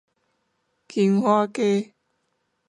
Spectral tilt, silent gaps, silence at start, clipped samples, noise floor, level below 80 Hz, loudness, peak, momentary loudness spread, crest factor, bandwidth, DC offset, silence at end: -7 dB/octave; none; 0.95 s; under 0.1%; -73 dBFS; -76 dBFS; -22 LUFS; -8 dBFS; 11 LU; 18 dB; 11 kHz; under 0.1%; 0.85 s